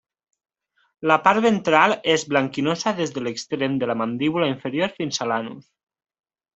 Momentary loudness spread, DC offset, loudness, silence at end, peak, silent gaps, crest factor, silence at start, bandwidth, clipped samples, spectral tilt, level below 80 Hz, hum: 9 LU; under 0.1%; -21 LUFS; 0.95 s; -2 dBFS; none; 22 dB; 1 s; 8.2 kHz; under 0.1%; -4.5 dB/octave; -64 dBFS; none